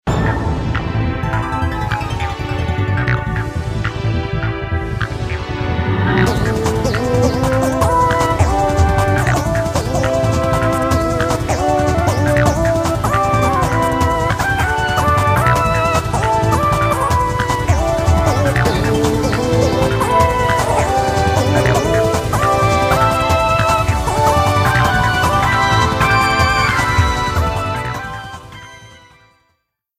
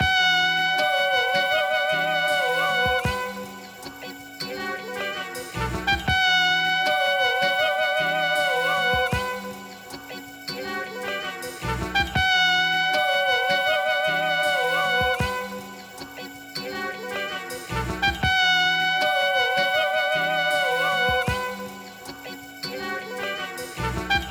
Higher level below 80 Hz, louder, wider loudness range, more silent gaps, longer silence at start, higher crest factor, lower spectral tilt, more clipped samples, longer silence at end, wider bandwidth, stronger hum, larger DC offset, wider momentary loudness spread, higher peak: first, -26 dBFS vs -44 dBFS; first, -15 LUFS vs -22 LUFS; about the same, 6 LU vs 7 LU; neither; about the same, 0.05 s vs 0 s; about the same, 16 dB vs 16 dB; first, -5.5 dB/octave vs -3 dB/octave; neither; first, 1 s vs 0 s; second, 16 kHz vs over 20 kHz; neither; neither; second, 7 LU vs 18 LU; first, 0 dBFS vs -8 dBFS